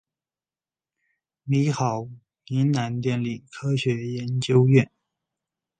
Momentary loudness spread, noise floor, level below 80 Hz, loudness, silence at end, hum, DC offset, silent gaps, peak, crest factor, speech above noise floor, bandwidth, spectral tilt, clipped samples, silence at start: 13 LU; under -90 dBFS; -62 dBFS; -24 LUFS; 0.95 s; none; under 0.1%; none; -4 dBFS; 20 dB; over 68 dB; 9.2 kHz; -7 dB/octave; under 0.1%; 1.45 s